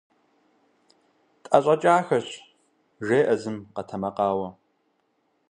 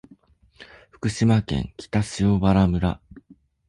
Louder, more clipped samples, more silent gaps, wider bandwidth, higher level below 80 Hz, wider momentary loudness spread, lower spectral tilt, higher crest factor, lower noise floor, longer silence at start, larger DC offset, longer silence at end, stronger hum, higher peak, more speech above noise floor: about the same, -24 LUFS vs -22 LUFS; neither; neither; about the same, 10.5 kHz vs 11 kHz; second, -66 dBFS vs -38 dBFS; first, 16 LU vs 10 LU; about the same, -6 dB/octave vs -7 dB/octave; first, 24 dB vs 16 dB; first, -70 dBFS vs -55 dBFS; first, 1.5 s vs 0.6 s; neither; first, 1 s vs 0.5 s; neither; first, -2 dBFS vs -6 dBFS; first, 48 dB vs 34 dB